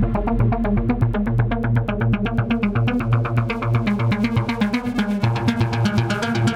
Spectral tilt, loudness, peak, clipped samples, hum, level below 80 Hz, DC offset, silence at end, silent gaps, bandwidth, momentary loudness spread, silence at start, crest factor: -7.5 dB/octave; -20 LUFS; -6 dBFS; under 0.1%; none; -32 dBFS; under 0.1%; 0 s; none; 9.8 kHz; 2 LU; 0 s; 14 dB